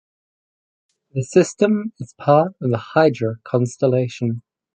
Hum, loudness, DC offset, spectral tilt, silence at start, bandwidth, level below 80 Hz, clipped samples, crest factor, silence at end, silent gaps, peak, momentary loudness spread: none; -19 LUFS; under 0.1%; -7 dB/octave; 1.15 s; 9.4 kHz; -62 dBFS; under 0.1%; 18 dB; 0.35 s; none; -2 dBFS; 10 LU